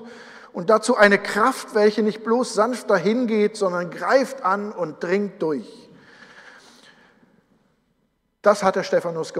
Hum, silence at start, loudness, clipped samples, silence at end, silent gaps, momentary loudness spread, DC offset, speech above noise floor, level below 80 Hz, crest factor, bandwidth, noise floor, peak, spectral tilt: none; 0 s; -21 LUFS; under 0.1%; 0 s; none; 11 LU; under 0.1%; 49 dB; -68 dBFS; 20 dB; 15 kHz; -69 dBFS; -2 dBFS; -5 dB/octave